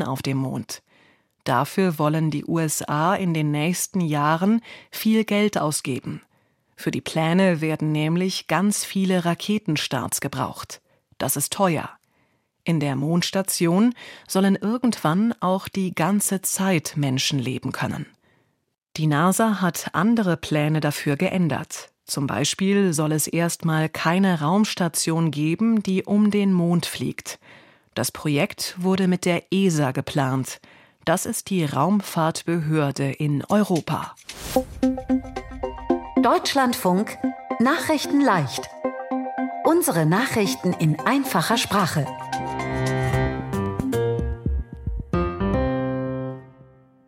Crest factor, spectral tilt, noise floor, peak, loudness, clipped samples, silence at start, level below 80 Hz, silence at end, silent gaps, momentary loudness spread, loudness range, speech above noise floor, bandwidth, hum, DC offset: 18 dB; -5 dB/octave; -67 dBFS; -6 dBFS; -22 LUFS; under 0.1%; 0 s; -44 dBFS; 0.55 s; none; 10 LU; 3 LU; 45 dB; 16.5 kHz; none; under 0.1%